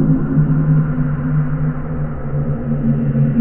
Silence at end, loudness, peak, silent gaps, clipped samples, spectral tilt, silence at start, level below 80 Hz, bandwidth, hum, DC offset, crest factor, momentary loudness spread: 0 s; -17 LUFS; -2 dBFS; none; under 0.1%; -14 dB/octave; 0 s; -28 dBFS; 2.9 kHz; none; under 0.1%; 12 dB; 7 LU